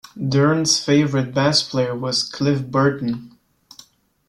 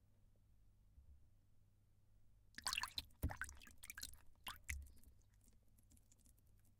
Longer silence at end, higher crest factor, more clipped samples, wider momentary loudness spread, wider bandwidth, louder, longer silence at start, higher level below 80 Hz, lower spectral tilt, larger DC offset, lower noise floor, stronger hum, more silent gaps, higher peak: first, 1 s vs 0.05 s; second, 16 dB vs 30 dB; neither; second, 6 LU vs 13 LU; second, 12.5 kHz vs 17 kHz; first, -19 LUFS vs -49 LUFS; first, 0.15 s vs 0 s; first, -56 dBFS vs -62 dBFS; first, -4.5 dB/octave vs -2 dB/octave; neither; second, -49 dBFS vs -72 dBFS; neither; neither; first, -4 dBFS vs -24 dBFS